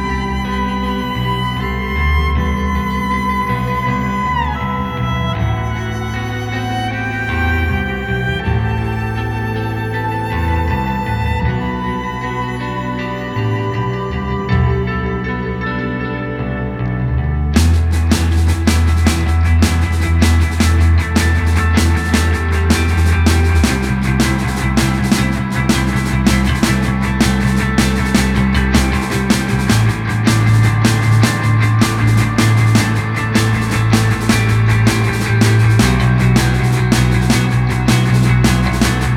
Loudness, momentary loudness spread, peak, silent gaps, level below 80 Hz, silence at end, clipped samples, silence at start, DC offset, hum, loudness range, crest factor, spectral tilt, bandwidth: -15 LUFS; 7 LU; 0 dBFS; none; -22 dBFS; 0 s; under 0.1%; 0 s; under 0.1%; none; 6 LU; 14 dB; -5.5 dB/octave; 16 kHz